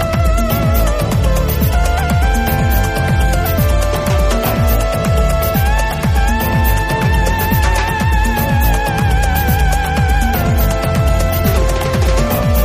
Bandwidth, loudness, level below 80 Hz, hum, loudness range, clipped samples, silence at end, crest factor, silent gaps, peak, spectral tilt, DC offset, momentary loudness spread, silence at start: 15.5 kHz; -15 LUFS; -16 dBFS; none; 0 LU; under 0.1%; 0 s; 12 dB; none; 0 dBFS; -5.5 dB/octave; under 0.1%; 1 LU; 0 s